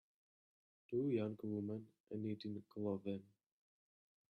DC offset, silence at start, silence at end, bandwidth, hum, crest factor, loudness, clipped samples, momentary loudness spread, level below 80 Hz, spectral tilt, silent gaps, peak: under 0.1%; 0.9 s; 1.1 s; 5.8 kHz; none; 18 dB; -45 LUFS; under 0.1%; 10 LU; -86 dBFS; -9.5 dB/octave; 2.00-2.04 s; -28 dBFS